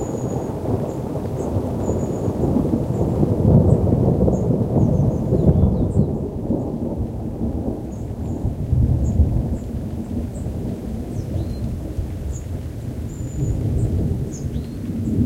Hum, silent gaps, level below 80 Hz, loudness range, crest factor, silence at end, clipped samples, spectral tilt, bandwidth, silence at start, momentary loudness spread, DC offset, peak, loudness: none; none; -28 dBFS; 9 LU; 18 dB; 0 s; under 0.1%; -9.5 dB/octave; 15.5 kHz; 0 s; 11 LU; under 0.1%; -2 dBFS; -22 LUFS